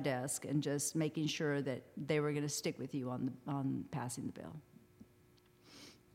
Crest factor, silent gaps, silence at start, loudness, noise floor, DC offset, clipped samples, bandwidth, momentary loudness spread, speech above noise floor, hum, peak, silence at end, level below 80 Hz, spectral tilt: 18 dB; none; 0 s; -39 LUFS; -67 dBFS; under 0.1%; under 0.1%; 16.5 kHz; 15 LU; 28 dB; none; -22 dBFS; 0.2 s; -76 dBFS; -5 dB/octave